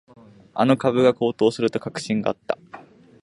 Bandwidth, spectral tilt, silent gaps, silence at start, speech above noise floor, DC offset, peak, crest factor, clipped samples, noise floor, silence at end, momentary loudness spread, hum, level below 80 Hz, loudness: 11.5 kHz; -6 dB/octave; none; 0.55 s; 24 dB; under 0.1%; -4 dBFS; 18 dB; under 0.1%; -45 dBFS; 0.45 s; 11 LU; none; -64 dBFS; -22 LUFS